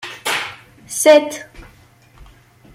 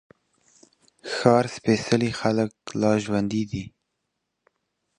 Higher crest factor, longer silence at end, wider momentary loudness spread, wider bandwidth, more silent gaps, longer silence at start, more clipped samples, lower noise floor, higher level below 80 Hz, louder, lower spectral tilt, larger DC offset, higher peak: second, 18 dB vs 24 dB; second, 0.5 s vs 1.3 s; first, 18 LU vs 12 LU; first, 16.5 kHz vs 11 kHz; neither; second, 0 s vs 1.05 s; neither; second, -49 dBFS vs -79 dBFS; first, -50 dBFS vs -56 dBFS; first, -15 LUFS vs -24 LUFS; second, -2 dB/octave vs -6 dB/octave; neither; about the same, -2 dBFS vs -2 dBFS